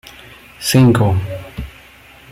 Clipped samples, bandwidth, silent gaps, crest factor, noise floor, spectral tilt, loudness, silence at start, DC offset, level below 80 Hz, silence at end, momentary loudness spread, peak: under 0.1%; 16 kHz; none; 16 dB; -43 dBFS; -6 dB/octave; -14 LUFS; 0.6 s; under 0.1%; -40 dBFS; 0.6 s; 22 LU; -2 dBFS